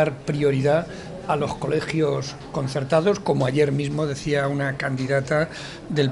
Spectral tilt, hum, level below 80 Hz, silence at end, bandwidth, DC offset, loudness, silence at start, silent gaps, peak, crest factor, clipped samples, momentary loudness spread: -6.5 dB/octave; none; -50 dBFS; 0 s; 11.5 kHz; under 0.1%; -23 LUFS; 0 s; none; -6 dBFS; 18 dB; under 0.1%; 8 LU